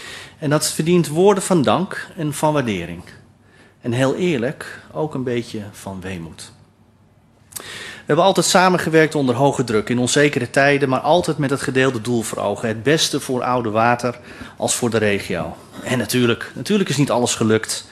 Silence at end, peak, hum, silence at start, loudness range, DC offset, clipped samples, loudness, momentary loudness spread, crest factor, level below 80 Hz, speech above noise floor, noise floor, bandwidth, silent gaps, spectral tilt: 0.05 s; 0 dBFS; none; 0 s; 8 LU; under 0.1%; under 0.1%; -18 LUFS; 16 LU; 18 dB; -54 dBFS; 34 dB; -53 dBFS; 14 kHz; none; -4.5 dB/octave